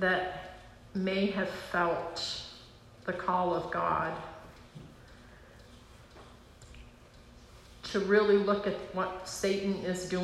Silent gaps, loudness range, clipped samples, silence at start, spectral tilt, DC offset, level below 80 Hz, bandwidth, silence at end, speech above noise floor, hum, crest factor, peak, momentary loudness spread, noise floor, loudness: none; 20 LU; under 0.1%; 0 s; -5 dB/octave; under 0.1%; -58 dBFS; 13 kHz; 0 s; 24 dB; none; 20 dB; -14 dBFS; 25 LU; -55 dBFS; -31 LUFS